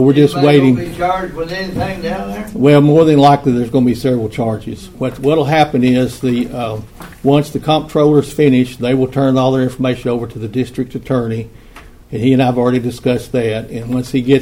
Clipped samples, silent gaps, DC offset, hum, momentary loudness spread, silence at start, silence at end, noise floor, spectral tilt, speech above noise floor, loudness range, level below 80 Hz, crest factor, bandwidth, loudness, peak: under 0.1%; none; under 0.1%; none; 13 LU; 0 s; 0 s; -38 dBFS; -7.5 dB/octave; 25 dB; 5 LU; -40 dBFS; 14 dB; 16 kHz; -14 LUFS; 0 dBFS